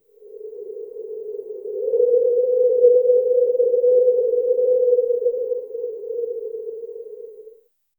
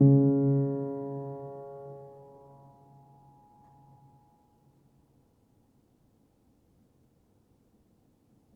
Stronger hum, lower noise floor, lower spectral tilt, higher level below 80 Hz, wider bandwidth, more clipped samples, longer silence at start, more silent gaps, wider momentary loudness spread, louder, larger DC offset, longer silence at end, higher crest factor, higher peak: neither; second, -51 dBFS vs -67 dBFS; second, -9 dB/octave vs -14 dB/octave; about the same, -72 dBFS vs -70 dBFS; second, 1 kHz vs 1.8 kHz; neither; first, 0.3 s vs 0 s; neither; second, 19 LU vs 30 LU; first, -19 LUFS vs -29 LUFS; neither; second, 0.5 s vs 6.45 s; about the same, 16 dB vs 20 dB; first, -4 dBFS vs -12 dBFS